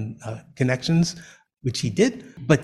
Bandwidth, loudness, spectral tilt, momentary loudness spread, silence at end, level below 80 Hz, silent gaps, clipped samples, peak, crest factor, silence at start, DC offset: 12 kHz; -24 LUFS; -5.5 dB/octave; 15 LU; 0 s; -52 dBFS; none; under 0.1%; -4 dBFS; 20 dB; 0 s; under 0.1%